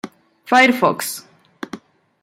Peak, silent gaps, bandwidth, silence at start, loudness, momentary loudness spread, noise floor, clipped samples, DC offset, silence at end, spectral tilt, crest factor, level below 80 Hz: -2 dBFS; none; 16.5 kHz; 0.05 s; -16 LUFS; 24 LU; -38 dBFS; under 0.1%; under 0.1%; 0.45 s; -3 dB/octave; 18 dB; -68 dBFS